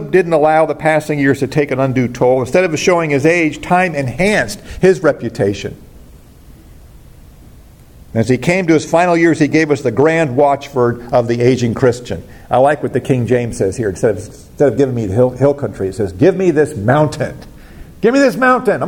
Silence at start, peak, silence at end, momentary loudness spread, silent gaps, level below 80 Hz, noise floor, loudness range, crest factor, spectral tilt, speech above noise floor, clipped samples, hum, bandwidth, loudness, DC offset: 0 s; 0 dBFS; 0 s; 7 LU; none; -42 dBFS; -40 dBFS; 5 LU; 14 dB; -6.5 dB/octave; 26 dB; under 0.1%; none; 17 kHz; -14 LUFS; under 0.1%